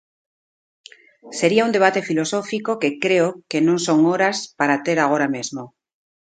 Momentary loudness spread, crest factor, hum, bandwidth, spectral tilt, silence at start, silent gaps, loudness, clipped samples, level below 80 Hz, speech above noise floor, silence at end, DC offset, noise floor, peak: 7 LU; 20 dB; none; 9.4 kHz; -4.5 dB/octave; 1.25 s; none; -19 LUFS; under 0.1%; -68 dBFS; over 71 dB; 0.7 s; under 0.1%; under -90 dBFS; 0 dBFS